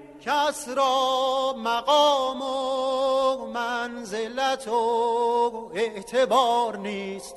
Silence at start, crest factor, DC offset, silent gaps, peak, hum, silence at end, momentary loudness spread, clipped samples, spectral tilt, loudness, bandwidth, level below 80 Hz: 0 s; 16 dB; under 0.1%; none; -8 dBFS; none; 0 s; 8 LU; under 0.1%; -2.5 dB/octave; -24 LUFS; 12.5 kHz; -64 dBFS